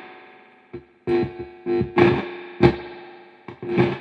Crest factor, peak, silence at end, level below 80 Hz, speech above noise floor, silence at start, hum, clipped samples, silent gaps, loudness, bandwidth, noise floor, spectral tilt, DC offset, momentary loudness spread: 22 dB; 0 dBFS; 0 s; -48 dBFS; 24 dB; 0 s; none; under 0.1%; none; -22 LUFS; 6 kHz; -49 dBFS; -8.5 dB/octave; under 0.1%; 24 LU